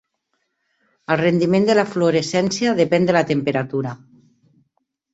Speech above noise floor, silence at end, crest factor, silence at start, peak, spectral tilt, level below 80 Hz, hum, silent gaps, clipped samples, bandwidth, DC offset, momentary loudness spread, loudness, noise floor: 55 dB; 1.2 s; 18 dB; 1.1 s; -2 dBFS; -5.5 dB/octave; -60 dBFS; none; none; under 0.1%; 8.2 kHz; under 0.1%; 10 LU; -18 LUFS; -72 dBFS